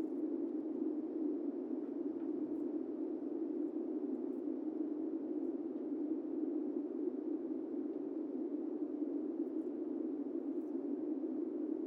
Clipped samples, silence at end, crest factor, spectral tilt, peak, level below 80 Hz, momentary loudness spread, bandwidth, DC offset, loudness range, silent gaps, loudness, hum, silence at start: under 0.1%; 0 s; 12 dB; -9 dB/octave; -28 dBFS; under -90 dBFS; 2 LU; 2.8 kHz; under 0.1%; 1 LU; none; -41 LUFS; none; 0 s